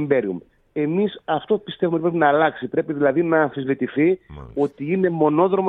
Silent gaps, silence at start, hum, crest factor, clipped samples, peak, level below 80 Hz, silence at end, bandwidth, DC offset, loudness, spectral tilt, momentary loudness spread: none; 0 s; none; 16 dB; under 0.1%; -4 dBFS; -54 dBFS; 0 s; 4 kHz; under 0.1%; -21 LUFS; -9.5 dB/octave; 8 LU